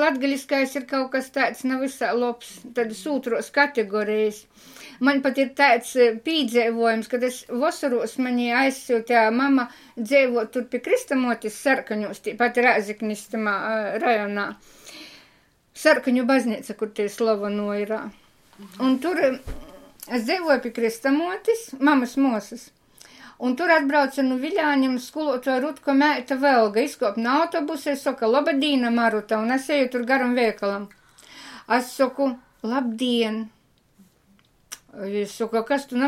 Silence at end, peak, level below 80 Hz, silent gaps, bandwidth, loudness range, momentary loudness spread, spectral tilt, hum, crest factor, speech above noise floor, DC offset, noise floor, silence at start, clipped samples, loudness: 0 s; -4 dBFS; -56 dBFS; none; 16 kHz; 4 LU; 11 LU; -4 dB/octave; none; 20 dB; 37 dB; under 0.1%; -60 dBFS; 0 s; under 0.1%; -23 LUFS